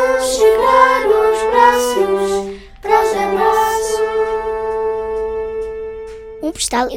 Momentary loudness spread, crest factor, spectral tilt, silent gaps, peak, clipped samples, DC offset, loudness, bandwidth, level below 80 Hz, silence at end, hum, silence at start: 14 LU; 16 dB; -2.5 dB/octave; none; 0 dBFS; under 0.1%; under 0.1%; -15 LUFS; 16.5 kHz; -40 dBFS; 0 s; none; 0 s